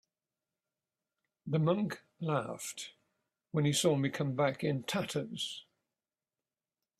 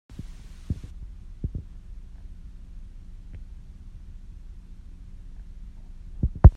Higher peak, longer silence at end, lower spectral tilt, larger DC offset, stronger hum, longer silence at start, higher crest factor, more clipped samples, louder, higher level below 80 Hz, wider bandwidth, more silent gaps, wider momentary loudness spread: second, -16 dBFS vs 0 dBFS; first, 1.4 s vs 0 s; second, -5 dB/octave vs -10 dB/octave; neither; neither; first, 1.45 s vs 0.1 s; second, 20 dB vs 26 dB; neither; second, -34 LUFS vs -29 LUFS; second, -74 dBFS vs -30 dBFS; first, 14.5 kHz vs 4.3 kHz; neither; about the same, 12 LU vs 12 LU